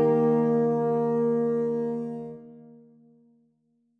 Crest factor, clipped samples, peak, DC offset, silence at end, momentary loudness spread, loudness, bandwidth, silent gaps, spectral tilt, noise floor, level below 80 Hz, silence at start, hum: 14 dB; under 0.1%; -12 dBFS; under 0.1%; 1.3 s; 15 LU; -25 LUFS; 3.3 kHz; none; -10.5 dB/octave; -70 dBFS; -70 dBFS; 0 s; none